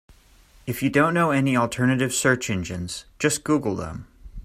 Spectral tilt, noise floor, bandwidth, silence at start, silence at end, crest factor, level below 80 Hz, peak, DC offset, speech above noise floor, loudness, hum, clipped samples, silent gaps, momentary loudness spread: -5 dB/octave; -53 dBFS; 16 kHz; 0.65 s; 0 s; 18 dB; -48 dBFS; -6 dBFS; under 0.1%; 31 dB; -23 LUFS; none; under 0.1%; none; 13 LU